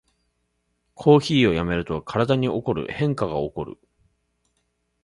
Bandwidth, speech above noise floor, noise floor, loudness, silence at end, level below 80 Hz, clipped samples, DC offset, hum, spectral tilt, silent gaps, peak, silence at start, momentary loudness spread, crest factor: 11.5 kHz; 51 dB; -72 dBFS; -22 LUFS; 1.3 s; -48 dBFS; under 0.1%; under 0.1%; none; -7 dB/octave; none; -2 dBFS; 1 s; 11 LU; 22 dB